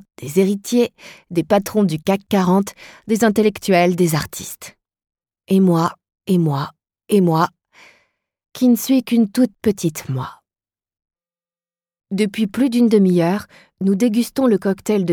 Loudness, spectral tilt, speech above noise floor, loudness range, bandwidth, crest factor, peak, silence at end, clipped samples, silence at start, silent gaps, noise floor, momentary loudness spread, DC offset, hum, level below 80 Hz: -18 LUFS; -6.5 dB/octave; over 73 dB; 4 LU; 19 kHz; 16 dB; -2 dBFS; 0 s; under 0.1%; 0.2 s; none; under -90 dBFS; 12 LU; under 0.1%; none; -56 dBFS